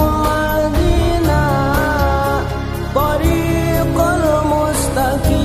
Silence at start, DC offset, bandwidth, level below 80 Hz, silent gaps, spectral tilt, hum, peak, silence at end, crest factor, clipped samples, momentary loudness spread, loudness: 0 s; under 0.1%; 15.5 kHz; -22 dBFS; none; -6 dB/octave; none; -2 dBFS; 0 s; 14 dB; under 0.1%; 3 LU; -16 LUFS